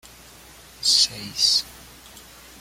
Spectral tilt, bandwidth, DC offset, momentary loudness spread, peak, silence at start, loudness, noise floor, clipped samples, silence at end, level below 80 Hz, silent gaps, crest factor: 0.5 dB/octave; 16.5 kHz; under 0.1%; 7 LU; -4 dBFS; 0.8 s; -19 LUFS; -47 dBFS; under 0.1%; 0.4 s; -54 dBFS; none; 22 dB